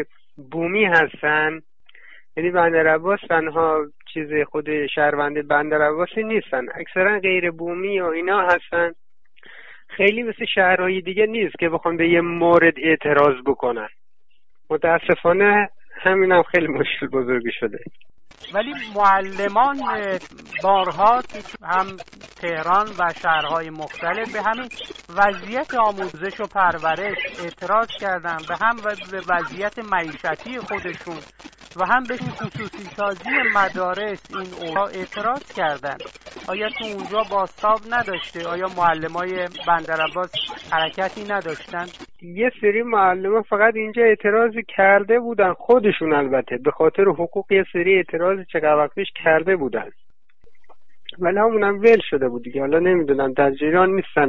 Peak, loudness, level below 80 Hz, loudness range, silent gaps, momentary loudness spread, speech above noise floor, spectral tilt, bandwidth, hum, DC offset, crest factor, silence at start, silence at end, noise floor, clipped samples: -4 dBFS; -20 LUFS; -56 dBFS; 6 LU; none; 13 LU; 50 dB; -6 dB/octave; 8 kHz; none; under 0.1%; 18 dB; 0 s; 0 s; -70 dBFS; under 0.1%